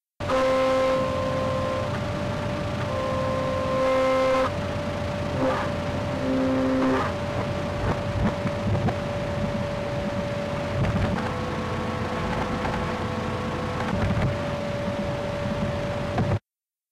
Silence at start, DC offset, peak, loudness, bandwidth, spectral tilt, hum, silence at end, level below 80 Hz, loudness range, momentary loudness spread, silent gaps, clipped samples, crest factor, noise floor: 0.2 s; under 0.1%; -16 dBFS; -26 LUFS; 14 kHz; -6.5 dB/octave; none; 0.55 s; -40 dBFS; 3 LU; 6 LU; none; under 0.1%; 10 dB; under -90 dBFS